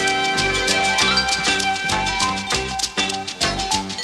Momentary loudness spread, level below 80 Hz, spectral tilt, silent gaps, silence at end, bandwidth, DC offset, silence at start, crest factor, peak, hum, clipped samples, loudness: 6 LU; -40 dBFS; -1.5 dB/octave; none; 0 s; 15 kHz; under 0.1%; 0 s; 16 dB; -4 dBFS; none; under 0.1%; -19 LUFS